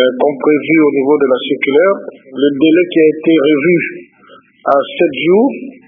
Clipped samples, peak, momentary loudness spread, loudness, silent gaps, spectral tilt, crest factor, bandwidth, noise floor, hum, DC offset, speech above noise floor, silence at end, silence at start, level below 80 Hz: under 0.1%; 0 dBFS; 6 LU; -12 LUFS; none; -9.5 dB/octave; 12 dB; 3.8 kHz; -43 dBFS; none; under 0.1%; 32 dB; 0.15 s; 0 s; -62 dBFS